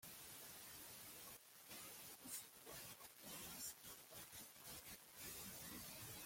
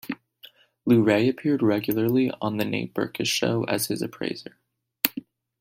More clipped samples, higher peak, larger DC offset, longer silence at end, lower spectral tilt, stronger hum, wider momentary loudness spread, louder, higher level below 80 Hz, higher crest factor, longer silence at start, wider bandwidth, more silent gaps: neither; second, -36 dBFS vs 0 dBFS; neither; second, 0 s vs 0.4 s; second, -1.5 dB/octave vs -5 dB/octave; neither; second, 5 LU vs 12 LU; second, -55 LUFS vs -24 LUFS; second, -78 dBFS vs -64 dBFS; about the same, 22 dB vs 26 dB; about the same, 0 s vs 0.05 s; about the same, 16.5 kHz vs 16.5 kHz; neither